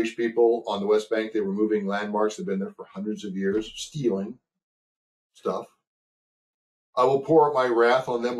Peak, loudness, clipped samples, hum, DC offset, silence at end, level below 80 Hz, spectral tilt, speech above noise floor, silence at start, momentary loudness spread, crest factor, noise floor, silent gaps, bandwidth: -8 dBFS; -25 LUFS; under 0.1%; none; under 0.1%; 0 s; -66 dBFS; -6 dB/octave; over 66 dB; 0 s; 13 LU; 18 dB; under -90 dBFS; 4.63-5.30 s, 5.87-6.93 s; 12 kHz